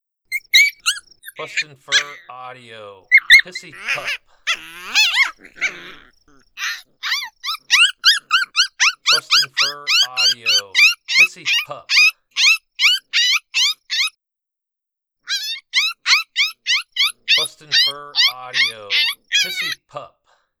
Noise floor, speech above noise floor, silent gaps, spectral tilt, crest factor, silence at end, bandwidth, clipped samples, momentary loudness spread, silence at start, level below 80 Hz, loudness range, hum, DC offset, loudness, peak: -84 dBFS; 65 dB; none; 2.5 dB/octave; 18 dB; 0.55 s; over 20 kHz; under 0.1%; 14 LU; 0.3 s; -62 dBFS; 6 LU; none; under 0.1%; -15 LUFS; 0 dBFS